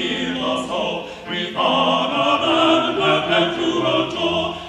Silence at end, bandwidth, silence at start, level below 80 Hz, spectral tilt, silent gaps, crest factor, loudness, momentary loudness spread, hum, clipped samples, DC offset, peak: 0 s; 11 kHz; 0 s; -52 dBFS; -4.5 dB/octave; none; 16 dB; -19 LUFS; 8 LU; none; under 0.1%; under 0.1%; -2 dBFS